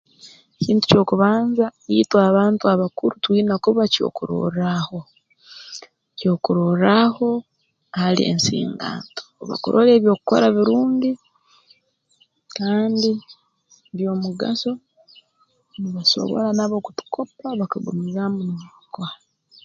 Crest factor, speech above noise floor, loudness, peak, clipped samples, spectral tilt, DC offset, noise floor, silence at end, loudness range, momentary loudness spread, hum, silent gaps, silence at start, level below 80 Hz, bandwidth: 20 dB; 45 dB; -19 LUFS; 0 dBFS; under 0.1%; -6 dB/octave; under 0.1%; -64 dBFS; 0.5 s; 7 LU; 17 LU; none; none; 0.25 s; -60 dBFS; 7.6 kHz